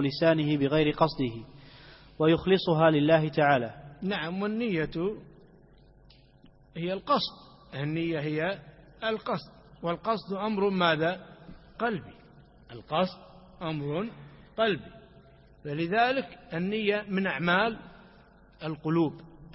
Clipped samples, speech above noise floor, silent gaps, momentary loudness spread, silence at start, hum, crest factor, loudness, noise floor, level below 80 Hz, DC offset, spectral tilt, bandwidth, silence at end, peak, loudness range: under 0.1%; 29 dB; none; 16 LU; 0 s; none; 20 dB; -28 LUFS; -57 dBFS; -58 dBFS; under 0.1%; -10 dB/octave; 5.8 kHz; 0 s; -8 dBFS; 8 LU